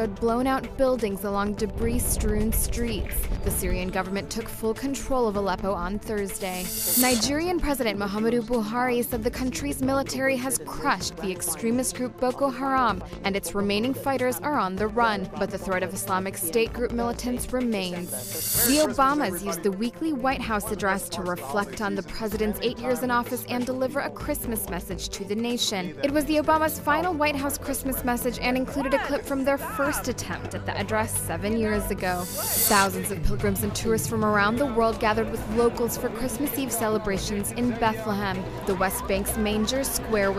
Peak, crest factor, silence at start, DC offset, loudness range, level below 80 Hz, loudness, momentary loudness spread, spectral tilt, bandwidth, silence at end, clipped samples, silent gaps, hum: -6 dBFS; 20 dB; 0 s; under 0.1%; 3 LU; -38 dBFS; -26 LUFS; 7 LU; -4 dB/octave; 15.5 kHz; 0 s; under 0.1%; none; none